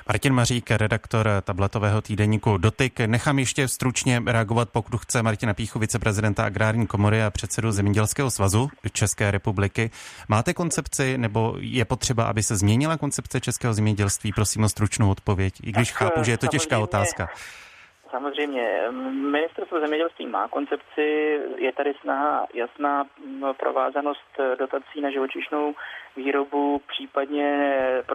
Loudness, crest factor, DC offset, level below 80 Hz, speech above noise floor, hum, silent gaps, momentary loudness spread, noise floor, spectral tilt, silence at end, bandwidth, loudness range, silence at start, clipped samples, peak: -24 LUFS; 18 dB; under 0.1%; -48 dBFS; 21 dB; none; none; 6 LU; -45 dBFS; -5 dB/octave; 0 s; 15.5 kHz; 4 LU; 0 s; under 0.1%; -6 dBFS